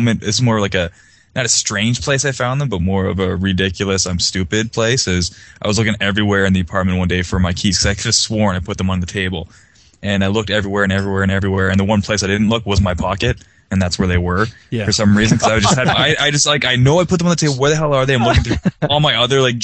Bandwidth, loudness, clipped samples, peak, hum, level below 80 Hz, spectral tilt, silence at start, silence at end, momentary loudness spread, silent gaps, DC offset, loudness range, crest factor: 9.2 kHz; -15 LUFS; under 0.1%; 0 dBFS; none; -34 dBFS; -4 dB/octave; 0 s; 0 s; 7 LU; none; under 0.1%; 4 LU; 16 dB